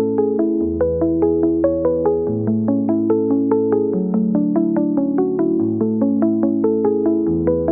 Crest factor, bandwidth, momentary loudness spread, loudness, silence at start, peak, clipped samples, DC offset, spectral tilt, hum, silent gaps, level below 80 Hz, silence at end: 12 dB; 2.3 kHz; 2 LU; -18 LUFS; 0 s; -6 dBFS; under 0.1%; 0.1%; -13.5 dB/octave; none; none; -48 dBFS; 0 s